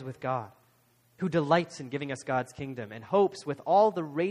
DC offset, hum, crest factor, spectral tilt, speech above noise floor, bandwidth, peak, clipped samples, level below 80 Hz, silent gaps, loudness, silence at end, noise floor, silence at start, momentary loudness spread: under 0.1%; none; 20 dB; -6.5 dB/octave; 37 dB; 12.5 kHz; -10 dBFS; under 0.1%; -68 dBFS; none; -29 LUFS; 0 s; -66 dBFS; 0 s; 14 LU